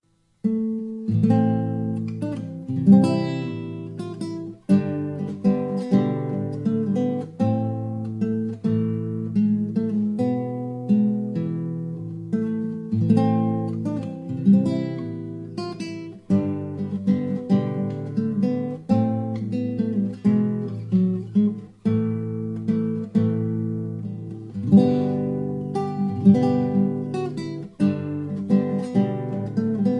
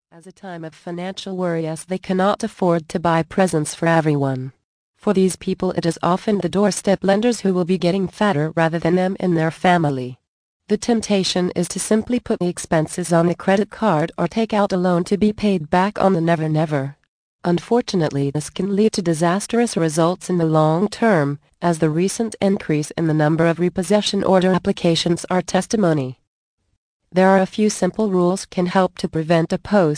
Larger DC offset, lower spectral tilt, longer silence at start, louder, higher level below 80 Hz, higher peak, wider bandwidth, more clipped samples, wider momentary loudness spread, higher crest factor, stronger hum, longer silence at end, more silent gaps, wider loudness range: neither; first, -9.5 dB/octave vs -6 dB/octave; first, 0.45 s vs 0.25 s; second, -23 LUFS vs -19 LUFS; second, -62 dBFS vs -52 dBFS; about the same, -4 dBFS vs -2 dBFS; second, 8.8 kHz vs 10.5 kHz; neither; first, 12 LU vs 7 LU; about the same, 20 dB vs 16 dB; neither; about the same, 0 s vs 0 s; second, none vs 4.64-4.94 s, 10.28-10.60 s, 17.08-17.39 s, 26.27-26.58 s, 26.77-27.00 s; about the same, 3 LU vs 2 LU